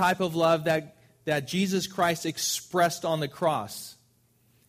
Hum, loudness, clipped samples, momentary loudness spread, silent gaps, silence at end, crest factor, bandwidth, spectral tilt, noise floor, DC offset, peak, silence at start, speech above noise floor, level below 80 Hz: none; -27 LUFS; under 0.1%; 10 LU; none; 0.75 s; 18 dB; 15.5 kHz; -4 dB/octave; -65 dBFS; under 0.1%; -10 dBFS; 0 s; 38 dB; -66 dBFS